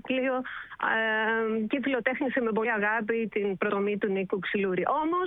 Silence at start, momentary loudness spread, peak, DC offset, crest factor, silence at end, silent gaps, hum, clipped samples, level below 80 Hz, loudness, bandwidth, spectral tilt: 0.05 s; 4 LU; -10 dBFS; under 0.1%; 18 dB; 0 s; none; none; under 0.1%; -66 dBFS; -28 LUFS; 4 kHz; -8.5 dB/octave